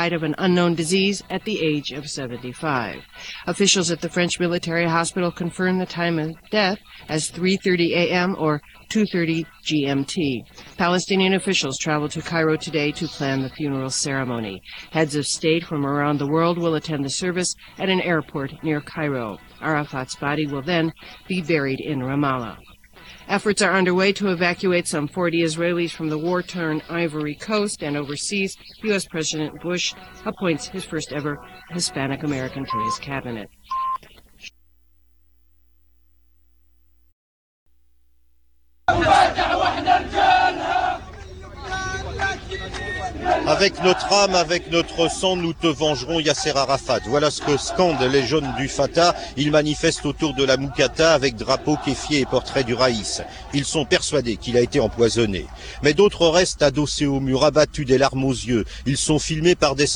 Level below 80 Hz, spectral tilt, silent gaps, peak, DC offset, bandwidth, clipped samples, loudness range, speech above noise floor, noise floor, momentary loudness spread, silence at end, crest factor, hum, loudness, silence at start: -44 dBFS; -4 dB/octave; 37.13-37.66 s; -4 dBFS; 0.1%; 19 kHz; under 0.1%; 6 LU; 43 dB; -64 dBFS; 11 LU; 0 s; 18 dB; none; -21 LUFS; 0 s